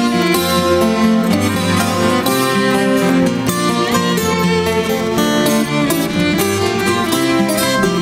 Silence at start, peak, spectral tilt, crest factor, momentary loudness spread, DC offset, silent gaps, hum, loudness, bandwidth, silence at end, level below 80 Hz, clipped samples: 0 s; -2 dBFS; -4.5 dB/octave; 12 dB; 2 LU; under 0.1%; none; none; -14 LUFS; 16.5 kHz; 0 s; -46 dBFS; under 0.1%